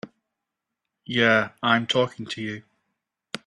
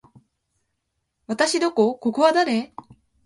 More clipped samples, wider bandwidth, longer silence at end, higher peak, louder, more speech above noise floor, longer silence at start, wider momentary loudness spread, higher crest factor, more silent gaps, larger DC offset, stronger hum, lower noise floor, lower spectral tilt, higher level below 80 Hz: neither; about the same, 11 kHz vs 11.5 kHz; second, 0.1 s vs 0.6 s; about the same, -4 dBFS vs -4 dBFS; second, -23 LUFS vs -20 LUFS; first, 61 dB vs 56 dB; second, 0.05 s vs 1.3 s; first, 15 LU vs 11 LU; about the same, 22 dB vs 20 dB; neither; neither; neither; first, -84 dBFS vs -76 dBFS; about the same, -4.5 dB/octave vs -3.5 dB/octave; about the same, -68 dBFS vs -68 dBFS